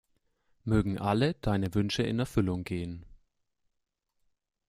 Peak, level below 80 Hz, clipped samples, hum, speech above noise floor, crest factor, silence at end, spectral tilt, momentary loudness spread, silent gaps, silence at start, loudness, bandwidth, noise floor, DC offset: -14 dBFS; -50 dBFS; under 0.1%; none; 54 dB; 18 dB; 1.55 s; -6.5 dB/octave; 10 LU; none; 0.65 s; -30 LUFS; 15 kHz; -83 dBFS; under 0.1%